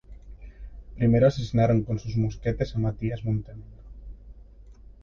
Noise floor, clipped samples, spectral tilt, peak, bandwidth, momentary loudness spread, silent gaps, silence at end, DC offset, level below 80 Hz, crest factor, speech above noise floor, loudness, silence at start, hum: -48 dBFS; under 0.1%; -8.5 dB/octave; -8 dBFS; 7 kHz; 26 LU; none; 0.3 s; under 0.1%; -42 dBFS; 18 dB; 24 dB; -25 LUFS; 0.1 s; none